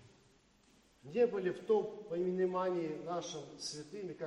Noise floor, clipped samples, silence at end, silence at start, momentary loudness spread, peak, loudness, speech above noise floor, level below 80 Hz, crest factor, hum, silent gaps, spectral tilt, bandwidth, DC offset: -68 dBFS; under 0.1%; 0 s; 0 s; 10 LU; -20 dBFS; -37 LUFS; 32 dB; -76 dBFS; 18 dB; none; none; -5.5 dB/octave; 11.5 kHz; under 0.1%